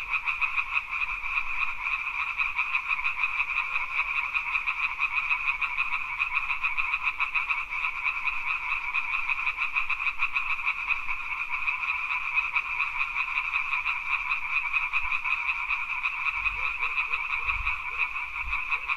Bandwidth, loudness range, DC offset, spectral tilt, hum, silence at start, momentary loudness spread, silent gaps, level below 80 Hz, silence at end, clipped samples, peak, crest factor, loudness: 15.5 kHz; 1 LU; under 0.1%; -1 dB/octave; none; 0 s; 3 LU; none; -50 dBFS; 0 s; under 0.1%; -10 dBFS; 18 dB; -27 LUFS